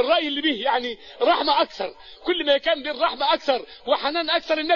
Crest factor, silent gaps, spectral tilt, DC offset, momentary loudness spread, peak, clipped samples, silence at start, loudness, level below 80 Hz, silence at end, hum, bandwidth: 16 dB; none; -3 dB/octave; 0.2%; 6 LU; -6 dBFS; under 0.1%; 0 s; -22 LUFS; -58 dBFS; 0 s; none; 7.2 kHz